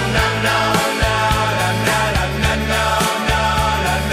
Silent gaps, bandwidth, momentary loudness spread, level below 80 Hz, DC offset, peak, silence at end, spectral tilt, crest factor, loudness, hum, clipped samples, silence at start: none; 16 kHz; 2 LU; -28 dBFS; under 0.1%; 0 dBFS; 0 s; -4 dB/octave; 16 dB; -16 LUFS; none; under 0.1%; 0 s